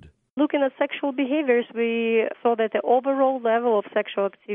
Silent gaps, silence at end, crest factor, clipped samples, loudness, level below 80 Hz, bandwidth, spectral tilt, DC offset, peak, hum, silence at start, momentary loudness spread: 0.30-0.37 s; 0 s; 14 dB; under 0.1%; -23 LUFS; -68 dBFS; 3.8 kHz; -8.5 dB/octave; under 0.1%; -8 dBFS; none; 0.05 s; 5 LU